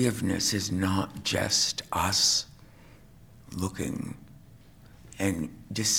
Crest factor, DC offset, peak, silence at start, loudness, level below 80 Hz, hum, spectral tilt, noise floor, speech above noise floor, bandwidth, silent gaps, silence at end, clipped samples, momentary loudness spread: 22 dB; under 0.1%; -8 dBFS; 0 s; -27 LUFS; -54 dBFS; none; -3 dB/octave; -52 dBFS; 24 dB; 19 kHz; none; 0 s; under 0.1%; 14 LU